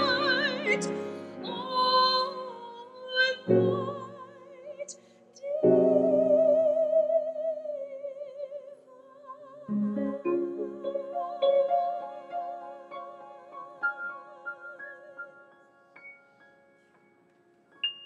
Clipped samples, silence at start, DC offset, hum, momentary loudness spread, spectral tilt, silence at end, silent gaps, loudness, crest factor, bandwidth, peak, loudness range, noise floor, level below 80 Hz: under 0.1%; 0 s; under 0.1%; none; 22 LU; -5 dB/octave; 0 s; none; -28 LUFS; 20 dB; 10.5 kHz; -10 dBFS; 14 LU; -64 dBFS; -80 dBFS